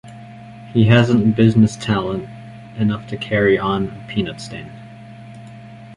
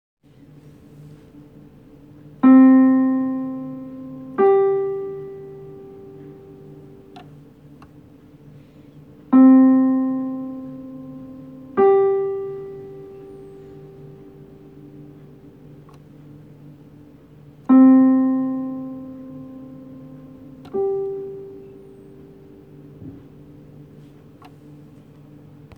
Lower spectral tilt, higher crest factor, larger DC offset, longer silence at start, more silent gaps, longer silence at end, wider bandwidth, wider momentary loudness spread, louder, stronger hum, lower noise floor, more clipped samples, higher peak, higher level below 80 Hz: second, -7 dB/octave vs -10 dB/octave; about the same, 16 dB vs 18 dB; neither; second, 0.05 s vs 2.45 s; neither; second, 0 s vs 2.65 s; first, 11 kHz vs 2.9 kHz; second, 25 LU vs 29 LU; about the same, -17 LUFS vs -17 LUFS; neither; second, -38 dBFS vs -47 dBFS; neither; about the same, -2 dBFS vs -4 dBFS; first, -46 dBFS vs -60 dBFS